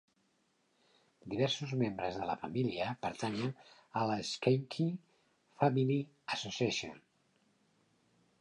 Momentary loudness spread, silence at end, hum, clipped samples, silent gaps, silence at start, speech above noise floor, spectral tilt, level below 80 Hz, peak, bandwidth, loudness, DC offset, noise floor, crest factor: 9 LU; 1.45 s; none; under 0.1%; none; 1.25 s; 41 dB; -5.5 dB/octave; -72 dBFS; -14 dBFS; 10.5 kHz; -36 LUFS; under 0.1%; -76 dBFS; 22 dB